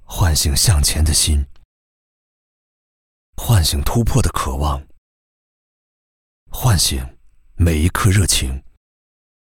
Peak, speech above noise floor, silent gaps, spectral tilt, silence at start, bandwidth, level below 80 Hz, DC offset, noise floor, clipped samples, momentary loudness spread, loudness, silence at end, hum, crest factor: 0 dBFS; over 74 dB; 1.65-3.33 s, 4.98-6.46 s; -4 dB/octave; 0.1 s; 17 kHz; -24 dBFS; under 0.1%; under -90 dBFS; under 0.1%; 14 LU; -17 LUFS; 0.8 s; none; 18 dB